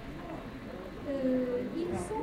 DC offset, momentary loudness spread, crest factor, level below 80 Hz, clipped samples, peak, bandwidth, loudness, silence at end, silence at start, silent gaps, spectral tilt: under 0.1%; 12 LU; 14 dB; -52 dBFS; under 0.1%; -20 dBFS; 15.5 kHz; -35 LUFS; 0 s; 0 s; none; -6.5 dB/octave